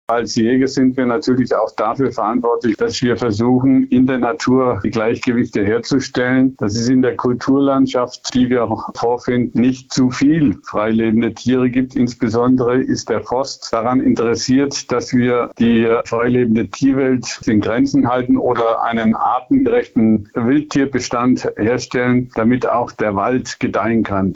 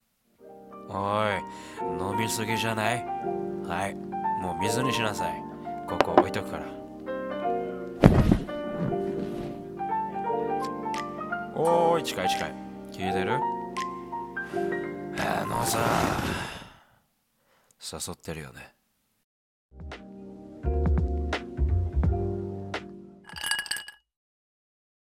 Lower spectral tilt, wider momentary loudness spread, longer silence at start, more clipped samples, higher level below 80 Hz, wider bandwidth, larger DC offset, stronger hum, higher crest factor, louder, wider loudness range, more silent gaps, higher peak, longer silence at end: about the same, -6 dB/octave vs -5.5 dB/octave; second, 4 LU vs 16 LU; second, 0.1 s vs 0.4 s; neither; second, -46 dBFS vs -38 dBFS; second, 7.8 kHz vs 17 kHz; neither; neither; second, 10 dB vs 28 dB; first, -16 LUFS vs -29 LUFS; second, 1 LU vs 8 LU; second, none vs 19.24-19.69 s; second, -6 dBFS vs -2 dBFS; second, 0 s vs 1.25 s